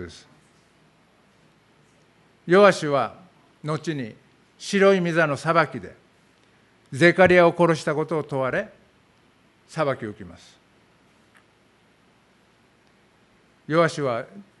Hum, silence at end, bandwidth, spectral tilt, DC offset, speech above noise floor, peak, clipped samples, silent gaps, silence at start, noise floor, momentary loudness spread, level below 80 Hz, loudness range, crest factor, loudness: none; 0.2 s; 11.5 kHz; -6 dB/octave; under 0.1%; 39 dB; -2 dBFS; under 0.1%; none; 0 s; -60 dBFS; 22 LU; -62 dBFS; 14 LU; 24 dB; -21 LUFS